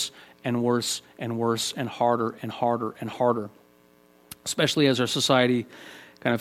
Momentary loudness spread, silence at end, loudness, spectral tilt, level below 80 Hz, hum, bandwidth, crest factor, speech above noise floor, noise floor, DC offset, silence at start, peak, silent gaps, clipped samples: 14 LU; 0 s; -25 LUFS; -4 dB/octave; -68 dBFS; none; 16.5 kHz; 20 dB; 33 dB; -58 dBFS; under 0.1%; 0 s; -6 dBFS; none; under 0.1%